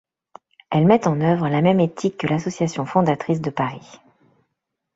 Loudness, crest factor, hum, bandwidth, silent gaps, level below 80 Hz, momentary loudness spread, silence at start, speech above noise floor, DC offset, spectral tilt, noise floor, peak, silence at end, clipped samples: -20 LUFS; 18 dB; none; 8 kHz; none; -58 dBFS; 8 LU; 0.7 s; 59 dB; under 0.1%; -7 dB/octave; -78 dBFS; -2 dBFS; 1.15 s; under 0.1%